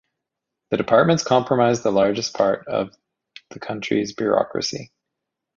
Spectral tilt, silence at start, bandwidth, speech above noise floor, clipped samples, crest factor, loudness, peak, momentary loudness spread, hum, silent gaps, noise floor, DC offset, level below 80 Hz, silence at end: -5 dB/octave; 0.7 s; 7.6 kHz; 63 dB; under 0.1%; 20 dB; -20 LUFS; -2 dBFS; 15 LU; none; none; -83 dBFS; under 0.1%; -58 dBFS; 0.75 s